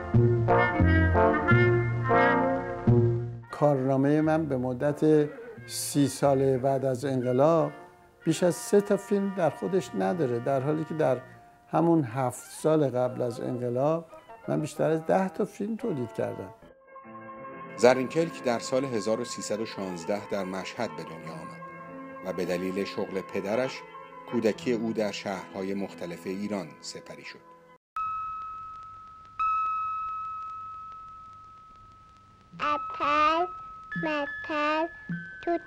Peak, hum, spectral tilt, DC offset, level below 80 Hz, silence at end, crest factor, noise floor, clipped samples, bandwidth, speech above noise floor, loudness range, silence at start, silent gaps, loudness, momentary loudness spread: -6 dBFS; none; -6.5 dB/octave; under 0.1%; -50 dBFS; 0 s; 22 dB; -55 dBFS; under 0.1%; 16 kHz; 27 dB; 9 LU; 0 s; 27.77-27.96 s; -27 LUFS; 18 LU